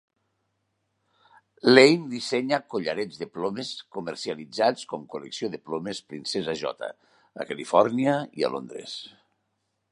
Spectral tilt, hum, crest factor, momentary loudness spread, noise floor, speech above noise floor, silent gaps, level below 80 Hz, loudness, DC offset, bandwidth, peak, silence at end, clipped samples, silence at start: -4.5 dB/octave; none; 26 dB; 18 LU; -77 dBFS; 51 dB; none; -72 dBFS; -25 LUFS; under 0.1%; 11.5 kHz; 0 dBFS; 0.85 s; under 0.1%; 1.65 s